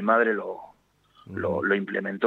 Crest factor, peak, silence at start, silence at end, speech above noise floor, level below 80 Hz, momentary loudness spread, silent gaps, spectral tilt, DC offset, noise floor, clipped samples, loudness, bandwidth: 18 dB; -8 dBFS; 0 s; 0 s; 35 dB; -68 dBFS; 16 LU; none; -8 dB/octave; under 0.1%; -60 dBFS; under 0.1%; -26 LUFS; 6.6 kHz